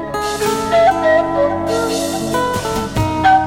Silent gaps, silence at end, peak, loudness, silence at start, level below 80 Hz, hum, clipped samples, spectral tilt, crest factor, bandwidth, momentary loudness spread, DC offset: none; 0 s; -2 dBFS; -16 LUFS; 0 s; -36 dBFS; none; under 0.1%; -4.5 dB/octave; 14 dB; 17 kHz; 7 LU; under 0.1%